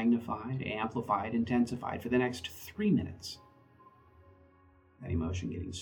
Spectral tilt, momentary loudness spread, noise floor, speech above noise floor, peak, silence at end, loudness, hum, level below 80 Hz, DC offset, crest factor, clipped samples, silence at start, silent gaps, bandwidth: -6.5 dB/octave; 11 LU; -63 dBFS; 30 dB; -16 dBFS; 0 s; -34 LUFS; none; -56 dBFS; under 0.1%; 18 dB; under 0.1%; 0 s; none; over 20 kHz